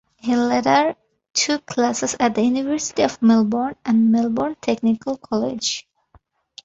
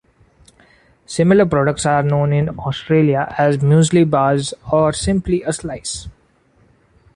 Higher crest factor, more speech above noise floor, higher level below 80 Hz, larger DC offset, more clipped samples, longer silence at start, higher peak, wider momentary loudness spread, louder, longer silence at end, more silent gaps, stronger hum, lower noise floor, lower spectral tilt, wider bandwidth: about the same, 18 dB vs 14 dB; about the same, 38 dB vs 40 dB; second, -58 dBFS vs -40 dBFS; neither; neither; second, 0.25 s vs 1.1 s; about the same, -2 dBFS vs -2 dBFS; second, 8 LU vs 12 LU; second, -20 LUFS vs -16 LUFS; second, 0.85 s vs 1.05 s; first, 1.30-1.34 s vs none; neither; about the same, -57 dBFS vs -55 dBFS; second, -4 dB/octave vs -6 dB/octave; second, 8 kHz vs 11.5 kHz